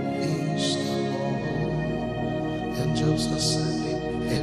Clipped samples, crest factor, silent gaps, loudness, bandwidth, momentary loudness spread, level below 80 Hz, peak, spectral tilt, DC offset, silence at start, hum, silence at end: under 0.1%; 14 dB; none; -26 LUFS; 14 kHz; 5 LU; -44 dBFS; -12 dBFS; -5.5 dB/octave; under 0.1%; 0 s; none; 0 s